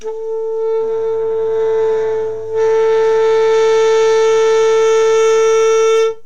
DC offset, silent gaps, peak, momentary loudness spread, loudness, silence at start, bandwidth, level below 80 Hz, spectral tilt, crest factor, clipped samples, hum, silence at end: 3%; none; -4 dBFS; 7 LU; -13 LUFS; 0 s; 8.2 kHz; -60 dBFS; -2 dB/octave; 8 dB; under 0.1%; none; 0.1 s